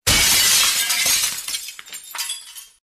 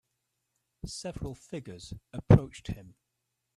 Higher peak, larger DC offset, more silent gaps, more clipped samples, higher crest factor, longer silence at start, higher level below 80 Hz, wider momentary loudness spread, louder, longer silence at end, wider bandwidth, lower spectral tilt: about the same, -4 dBFS vs -4 dBFS; neither; neither; neither; second, 18 dB vs 28 dB; second, 0.05 s vs 0.85 s; about the same, -42 dBFS vs -46 dBFS; about the same, 19 LU vs 21 LU; first, -16 LUFS vs -28 LUFS; second, 0.3 s vs 0.75 s; first, 15 kHz vs 11.5 kHz; second, 0.5 dB/octave vs -7.5 dB/octave